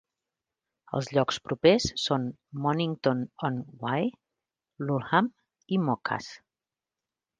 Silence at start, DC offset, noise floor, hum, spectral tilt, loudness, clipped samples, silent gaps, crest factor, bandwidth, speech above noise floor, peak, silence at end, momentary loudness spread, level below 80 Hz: 0.9 s; under 0.1%; under -90 dBFS; none; -5.5 dB/octave; -28 LUFS; under 0.1%; none; 22 dB; 9.8 kHz; over 63 dB; -8 dBFS; 1.05 s; 11 LU; -58 dBFS